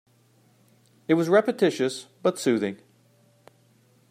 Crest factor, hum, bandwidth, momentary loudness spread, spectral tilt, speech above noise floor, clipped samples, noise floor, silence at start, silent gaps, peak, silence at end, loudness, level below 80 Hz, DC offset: 20 dB; none; 16 kHz; 12 LU; -5.5 dB/octave; 38 dB; under 0.1%; -61 dBFS; 1.1 s; none; -6 dBFS; 1.35 s; -24 LUFS; -78 dBFS; under 0.1%